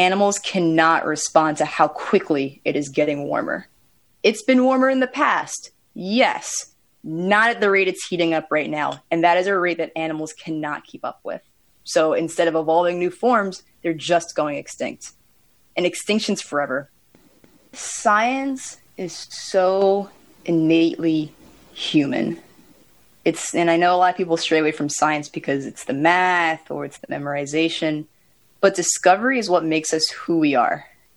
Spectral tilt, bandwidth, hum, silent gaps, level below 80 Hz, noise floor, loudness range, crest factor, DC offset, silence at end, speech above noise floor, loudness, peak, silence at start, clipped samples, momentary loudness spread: -4 dB/octave; 19.5 kHz; none; none; -68 dBFS; -61 dBFS; 4 LU; 20 dB; under 0.1%; 0.3 s; 41 dB; -20 LUFS; -2 dBFS; 0 s; under 0.1%; 14 LU